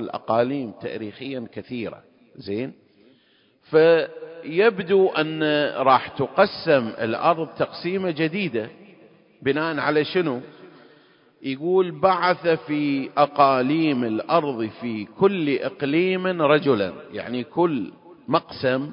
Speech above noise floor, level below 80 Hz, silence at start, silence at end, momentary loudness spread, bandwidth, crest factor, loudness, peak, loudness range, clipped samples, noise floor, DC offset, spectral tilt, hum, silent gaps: 38 dB; -64 dBFS; 0 s; 0 s; 14 LU; 5.4 kHz; 20 dB; -22 LUFS; -2 dBFS; 5 LU; under 0.1%; -60 dBFS; under 0.1%; -10.5 dB/octave; none; none